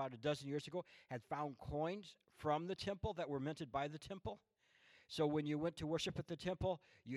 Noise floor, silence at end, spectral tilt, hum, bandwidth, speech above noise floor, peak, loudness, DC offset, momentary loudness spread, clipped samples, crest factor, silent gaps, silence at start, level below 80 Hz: -71 dBFS; 0 s; -6 dB/octave; none; 13.5 kHz; 27 dB; -26 dBFS; -44 LUFS; under 0.1%; 10 LU; under 0.1%; 18 dB; none; 0 s; -66 dBFS